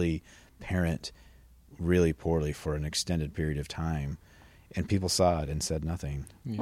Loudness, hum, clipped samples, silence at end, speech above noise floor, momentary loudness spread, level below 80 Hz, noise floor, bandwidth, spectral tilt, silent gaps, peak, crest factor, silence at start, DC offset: -31 LUFS; none; under 0.1%; 0 s; 26 dB; 13 LU; -44 dBFS; -56 dBFS; 16 kHz; -5.5 dB/octave; none; -12 dBFS; 18 dB; 0 s; under 0.1%